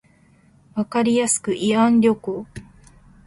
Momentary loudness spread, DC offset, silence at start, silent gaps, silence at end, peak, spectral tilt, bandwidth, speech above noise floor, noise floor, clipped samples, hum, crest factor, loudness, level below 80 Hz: 16 LU; under 0.1%; 0.75 s; none; 0.65 s; -4 dBFS; -4.5 dB/octave; 11.5 kHz; 36 dB; -55 dBFS; under 0.1%; none; 16 dB; -19 LUFS; -56 dBFS